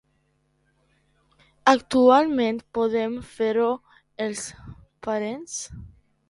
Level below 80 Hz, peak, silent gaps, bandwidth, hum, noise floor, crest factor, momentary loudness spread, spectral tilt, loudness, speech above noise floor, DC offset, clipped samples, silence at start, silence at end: -56 dBFS; -2 dBFS; none; 11.5 kHz; none; -68 dBFS; 22 dB; 17 LU; -4 dB/octave; -23 LUFS; 46 dB; under 0.1%; under 0.1%; 1.65 s; 0.45 s